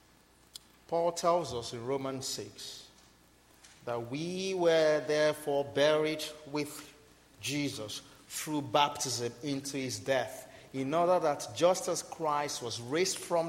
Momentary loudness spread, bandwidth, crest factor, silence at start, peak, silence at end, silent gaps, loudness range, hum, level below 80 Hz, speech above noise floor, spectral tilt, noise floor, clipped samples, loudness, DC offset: 15 LU; 16 kHz; 20 dB; 0.9 s; -12 dBFS; 0 s; none; 5 LU; none; -70 dBFS; 31 dB; -3.5 dB/octave; -63 dBFS; under 0.1%; -32 LUFS; under 0.1%